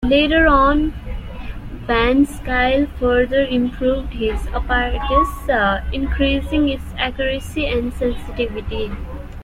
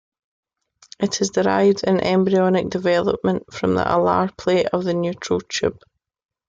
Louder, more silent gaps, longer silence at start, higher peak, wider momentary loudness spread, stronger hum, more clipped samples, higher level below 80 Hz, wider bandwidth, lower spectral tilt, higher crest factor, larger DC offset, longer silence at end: about the same, -18 LUFS vs -20 LUFS; neither; second, 0 s vs 1 s; about the same, -2 dBFS vs -4 dBFS; first, 13 LU vs 7 LU; neither; neither; first, -26 dBFS vs -52 dBFS; first, 15 kHz vs 7.8 kHz; about the same, -6 dB/octave vs -5.5 dB/octave; about the same, 16 dB vs 16 dB; neither; second, 0 s vs 0.75 s